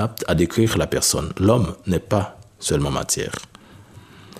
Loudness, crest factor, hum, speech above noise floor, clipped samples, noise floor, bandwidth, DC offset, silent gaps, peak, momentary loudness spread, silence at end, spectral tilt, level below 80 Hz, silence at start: -21 LUFS; 20 dB; none; 24 dB; under 0.1%; -45 dBFS; 15.5 kHz; under 0.1%; none; -2 dBFS; 9 LU; 0 s; -4.5 dB/octave; -40 dBFS; 0 s